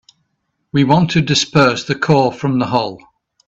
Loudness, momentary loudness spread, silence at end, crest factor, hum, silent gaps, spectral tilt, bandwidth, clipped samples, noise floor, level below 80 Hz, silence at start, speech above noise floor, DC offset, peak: -15 LUFS; 6 LU; 0.5 s; 16 dB; none; none; -5.5 dB/octave; 8 kHz; under 0.1%; -70 dBFS; -48 dBFS; 0.75 s; 55 dB; under 0.1%; 0 dBFS